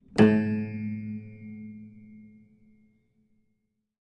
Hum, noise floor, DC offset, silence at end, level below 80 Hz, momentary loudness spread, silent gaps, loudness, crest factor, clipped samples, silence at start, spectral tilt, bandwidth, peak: none; -77 dBFS; under 0.1%; 1.9 s; -64 dBFS; 24 LU; none; -26 LUFS; 24 dB; under 0.1%; 0.15 s; -8 dB/octave; 9 kHz; -6 dBFS